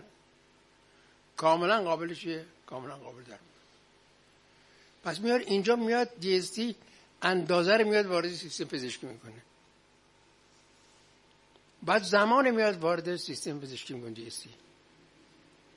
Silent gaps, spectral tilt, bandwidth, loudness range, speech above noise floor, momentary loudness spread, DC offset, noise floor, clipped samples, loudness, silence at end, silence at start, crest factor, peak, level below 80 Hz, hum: none; -4.5 dB/octave; 11.5 kHz; 12 LU; 34 dB; 20 LU; under 0.1%; -64 dBFS; under 0.1%; -29 LUFS; 1.25 s; 1.35 s; 24 dB; -8 dBFS; -76 dBFS; 50 Hz at -75 dBFS